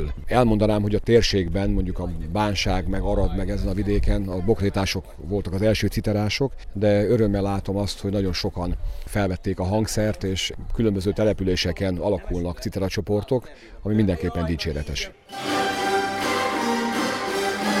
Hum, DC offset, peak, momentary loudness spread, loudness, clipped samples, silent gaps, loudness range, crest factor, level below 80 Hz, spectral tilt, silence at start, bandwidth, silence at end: none; under 0.1%; -4 dBFS; 8 LU; -24 LUFS; under 0.1%; none; 2 LU; 18 dB; -32 dBFS; -5.5 dB/octave; 0 s; 16 kHz; 0 s